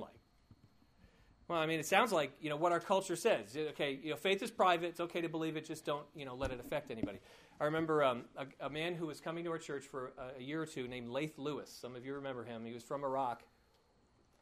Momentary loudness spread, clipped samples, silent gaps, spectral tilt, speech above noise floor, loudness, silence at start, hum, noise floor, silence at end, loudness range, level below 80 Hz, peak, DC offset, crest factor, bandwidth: 13 LU; under 0.1%; none; -4.5 dB/octave; 33 dB; -38 LUFS; 0 s; none; -71 dBFS; 0.95 s; 8 LU; -66 dBFS; -14 dBFS; under 0.1%; 24 dB; 15.5 kHz